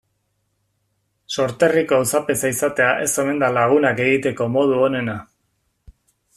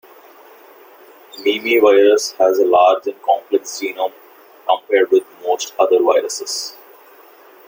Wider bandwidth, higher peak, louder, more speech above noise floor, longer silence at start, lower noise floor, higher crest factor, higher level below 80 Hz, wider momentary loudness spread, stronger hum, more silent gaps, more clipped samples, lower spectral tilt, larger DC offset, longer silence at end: second, 15 kHz vs 17 kHz; about the same, -2 dBFS vs 0 dBFS; about the same, -18 LUFS vs -16 LUFS; first, 52 dB vs 29 dB; about the same, 1.3 s vs 1.35 s; first, -70 dBFS vs -45 dBFS; about the same, 18 dB vs 16 dB; first, -56 dBFS vs -68 dBFS; second, 7 LU vs 12 LU; neither; neither; neither; first, -4.5 dB/octave vs -1.5 dB/octave; neither; first, 1.15 s vs 0.95 s